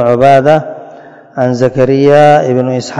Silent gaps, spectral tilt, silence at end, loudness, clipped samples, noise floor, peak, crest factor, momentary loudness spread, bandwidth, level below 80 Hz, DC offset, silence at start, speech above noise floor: none; -7 dB/octave; 0 s; -8 LUFS; 4%; -34 dBFS; 0 dBFS; 8 dB; 16 LU; 11 kHz; -44 dBFS; under 0.1%; 0 s; 26 dB